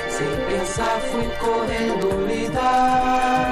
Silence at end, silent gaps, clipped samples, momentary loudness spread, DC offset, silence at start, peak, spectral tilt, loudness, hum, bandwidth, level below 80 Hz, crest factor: 0 s; none; under 0.1%; 5 LU; under 0.1%; 0 s; -8 dBFS; -4.5 dB/octave; -21 LUFS; none; 15 kHz; -38 dBFS; 12 dB